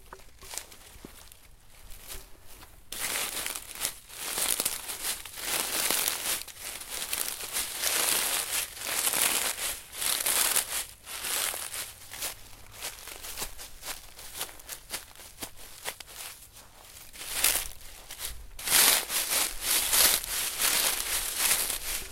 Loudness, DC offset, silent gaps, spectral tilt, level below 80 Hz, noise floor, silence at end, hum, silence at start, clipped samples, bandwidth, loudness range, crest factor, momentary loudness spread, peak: -27 LUFS; under 0.1%; none; 1 dB/octave; -52 dBFS; -52 dBFS; 0 s; none; 0 s; under 0.1%; 17 kHz; 15 LU; 26 dB; 18 LU; -6 dBFS